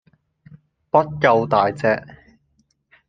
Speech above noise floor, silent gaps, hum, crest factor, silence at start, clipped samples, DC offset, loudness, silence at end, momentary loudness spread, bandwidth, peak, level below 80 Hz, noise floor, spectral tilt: 47 dB; none; none; 20 dB; 0.95 s; under 0.1%; under 0.1%; -18 LUFS; 1.1 s; 5 LU; 9.2 kHz; -2 dBFS; -58 dBFS; -65 dBFS; -7 dB/octave